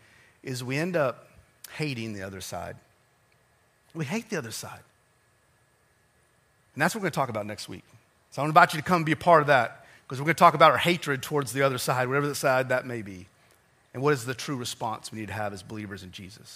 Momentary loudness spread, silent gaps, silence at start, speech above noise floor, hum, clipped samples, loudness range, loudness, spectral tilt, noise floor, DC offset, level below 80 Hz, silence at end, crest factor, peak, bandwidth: 22 LU; none; 0.45 s; 39 dB; none; under 0.1%; 16 LU; -26 LUFS; -4.5 dB/octave; -65 dBFS; under 0.1%; -66 dBFS; 0 s; 24 dB; -2 dBFS; 15.5 kHz